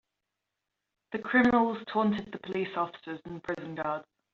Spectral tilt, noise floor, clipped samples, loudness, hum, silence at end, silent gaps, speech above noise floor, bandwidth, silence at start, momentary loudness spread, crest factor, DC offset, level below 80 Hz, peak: -4 dB/octave; -86 dBFS; under 0.1%; -30 LUFS; none; 0.3 s; none; 56 dB; 7 kHz; 1.1 s; 15 LU; 20 dB; under 0.1%; -66 dBFS; -10 dBFS